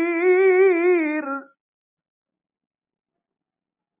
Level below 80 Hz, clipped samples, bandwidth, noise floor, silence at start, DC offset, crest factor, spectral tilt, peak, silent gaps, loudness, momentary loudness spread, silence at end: under -90 dBFS; under 0.1%; 3.8 kHz; -88 dBFS; 0 s; under 0.1%; 14 dB; -7.5 dB/octave; -8 dBFS; none; -18 LUFS; 14 LU; 2.55 s